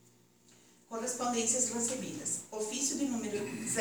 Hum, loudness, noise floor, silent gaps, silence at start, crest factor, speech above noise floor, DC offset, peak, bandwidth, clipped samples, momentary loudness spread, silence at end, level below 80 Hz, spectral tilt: 60 Hz at -60 dBFS; -33 LUFS; -64 dBFS; none; 0.5 s; 20 dB; 29 dB; under 0.1%; -16 dBFS; over 20 kHz; under 0.1%; 8 LU; 0 s; -78 dBFS; -2.5 dB/octave